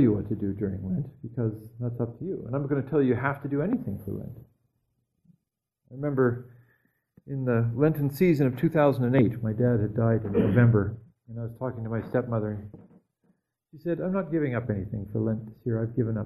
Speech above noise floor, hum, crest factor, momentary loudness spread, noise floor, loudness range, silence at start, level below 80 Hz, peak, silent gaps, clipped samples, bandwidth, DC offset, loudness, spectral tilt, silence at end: 57 dB; none; 20 dB; 13 LU; -83 dBFS; 9 LU; 0 s; -54 dBFS; -8 dBFS; none; under 0.1%; 13 kHz; under 0.1%; -27 LUFS; -10 dB/octave; 0 s